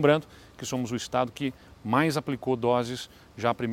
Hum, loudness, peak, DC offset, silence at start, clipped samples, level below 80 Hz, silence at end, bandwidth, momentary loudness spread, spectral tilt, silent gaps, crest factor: none; -28 LUFS; -6 dBFS; under 0.1%; 0 s; under 0.1%; -60 dBFS; 0 s; 16.5 kHz; 12 LU; -5.5 dB/octave; none; 22 dB